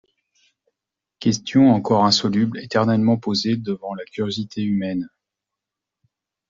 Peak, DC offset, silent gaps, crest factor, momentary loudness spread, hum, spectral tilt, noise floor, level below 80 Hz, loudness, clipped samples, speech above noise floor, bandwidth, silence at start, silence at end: -4 dBFS; under 0.1%; none; 18 dB; 12 LU; none; -5.5 dB/octave; -85 dBFS; -60 dBFS; -20 LUFS; under 0.1%; 65 dB; 7.6 kHz; 1.2 s; 1.45 s